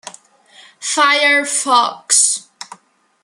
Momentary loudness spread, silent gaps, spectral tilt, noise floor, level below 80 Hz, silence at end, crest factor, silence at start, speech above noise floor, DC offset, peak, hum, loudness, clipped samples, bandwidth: 22 LU; none; 2 dB/octave; -52 dBFS; -80 dBFS; 0.6 s; 18 dB; 0.05 s; 38 dB; under 0.1%; 0 dBFS; none; -13 LUFS; under 0.1%; 13 kHz